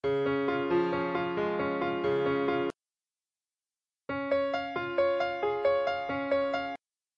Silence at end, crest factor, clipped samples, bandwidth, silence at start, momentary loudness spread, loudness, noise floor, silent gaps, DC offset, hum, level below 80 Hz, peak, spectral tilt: 0.4 s; 14 dB; under 0.1%; 7 kHz; 0.05 s; 7 LU; -30 LUFS; under -90 dBFS; none; under 0.1%; none; -68 dBFS; -16 dBFS; -7 dB/octave